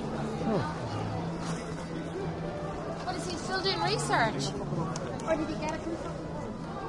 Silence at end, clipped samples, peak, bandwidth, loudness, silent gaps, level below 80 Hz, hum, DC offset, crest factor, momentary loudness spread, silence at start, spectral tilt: 0 s; under 0.1%; -14 dBFS; 11.5 kHz; -33 LUFS; none; -50 dBFS; none; under 0.1%; 18 dB; 9 LU; 0 s; -5 dB/octave